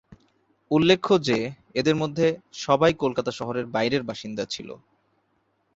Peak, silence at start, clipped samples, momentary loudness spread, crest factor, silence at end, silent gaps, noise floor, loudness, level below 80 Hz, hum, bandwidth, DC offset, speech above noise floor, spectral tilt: -4 dBFS; 0.1 s; under 0.1%; 12 LU; 20 dB; 1 s; none; -70 dBFS; -24 LUFS; -60 dBFS; none; 8 kHz; under 0.1%; 46 dB; -5.5 dB/octave